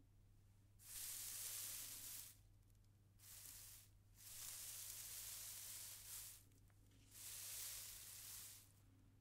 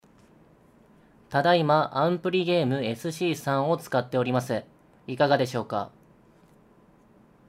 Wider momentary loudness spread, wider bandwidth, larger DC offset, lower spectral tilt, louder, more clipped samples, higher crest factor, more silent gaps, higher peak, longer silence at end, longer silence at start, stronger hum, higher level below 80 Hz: first, 15 LU vs 10 LU; about the same, 16 kHz vs 16 kHz; neither; second, 0 dB/octave vs -6 dB/octave; second, -52 LUFS vs -25 LUFS; neither; about the same, 22 dB vs 20 dB; neither; second, -36 dBFS vs -8 dBFS; second, 0 s vs 1.6 s; second, 0 s vs 1.3 s; neither; second, -76 dBFS vs -68 dBFS